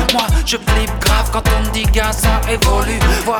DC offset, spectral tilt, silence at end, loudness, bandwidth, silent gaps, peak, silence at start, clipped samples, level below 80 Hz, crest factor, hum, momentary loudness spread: under 0.1%; -4 dB/octave; 0 s; -15 LUFS; 19.5 kHz; none; 0 dBFS; 0 s; under 0.1%; -16 dBFS; 14 dB; none; 2 LU